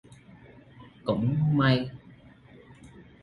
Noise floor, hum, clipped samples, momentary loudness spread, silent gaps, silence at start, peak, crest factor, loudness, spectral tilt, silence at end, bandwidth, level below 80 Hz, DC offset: -53 dBFS; none; under 0.1%; 15 LU; none; 0.8 s; -12 dBFS; 18 dB; -26 LUFS; -8.5 dB/octave; 0.2 s; 5.4 kHz; -56 dBFS; under 0.1%